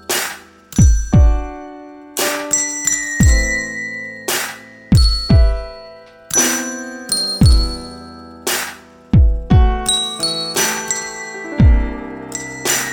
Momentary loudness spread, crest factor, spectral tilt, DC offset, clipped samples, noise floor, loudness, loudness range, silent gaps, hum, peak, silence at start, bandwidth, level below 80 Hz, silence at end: 15 LU; 14 dB; -3.5 dB/octave; under 0.1%; under 0.1%; -39 dBFS; -16 LUFS; 2 LU; none; none; -2 dBFS; 0.1 s; over 20 kHz; -20 dBFS; 0 s